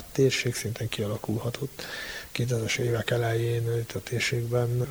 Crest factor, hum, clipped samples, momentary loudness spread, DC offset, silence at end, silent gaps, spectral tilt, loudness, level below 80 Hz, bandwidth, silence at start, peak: 18 dB; none; under 0.1%; 9 LU; under 0.1%; 0 s; none; -5 dB/octave; -28 LUFS; -54 dBFS; over 20 kHz; 0 s; -10 dBFS